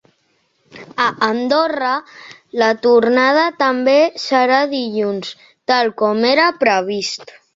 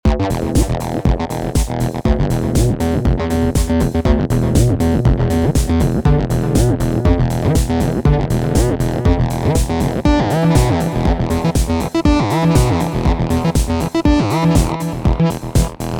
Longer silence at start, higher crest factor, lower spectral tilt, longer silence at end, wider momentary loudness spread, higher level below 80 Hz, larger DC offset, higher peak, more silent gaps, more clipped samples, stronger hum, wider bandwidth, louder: first, 0.75 s vs 0.05 s; about the same, 16 dB vs 14 dB; second, -4 dB/octave vs -6.5 dB/octave; first, 0.25 s vs 0 s; first, 11 LU vs 4 LU; second, -64 dBFS vs -20 dBFS; neither; about the same, 0 dBFS vs 0 dBFS; neither; neither; neither; second, 7.8 kHz vs 20 kHz; about the same, -15 LUFS vs -16 LUFS